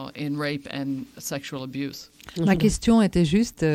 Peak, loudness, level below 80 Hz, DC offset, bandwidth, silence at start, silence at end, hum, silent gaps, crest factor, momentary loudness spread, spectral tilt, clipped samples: -8 dBFS; -24 LUFS; -42 dBFS; under 0.1%; 16 kHz; 0 s; 0 s; none; none; 16 dB; 13 LU; -6 dB/octave; under 0.1%